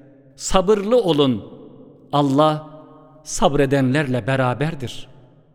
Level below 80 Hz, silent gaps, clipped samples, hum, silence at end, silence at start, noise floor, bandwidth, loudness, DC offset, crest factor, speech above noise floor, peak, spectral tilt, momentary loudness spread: -38 dBFS; none; under 0.1%; none; 0.5 s; 0.4 s; -44 dBFS; 16 kHz; -19 LUFS; under 0.1%; 20 dB; 26 dB; 0 dBFS; -5.5 dB/octave; 14 LU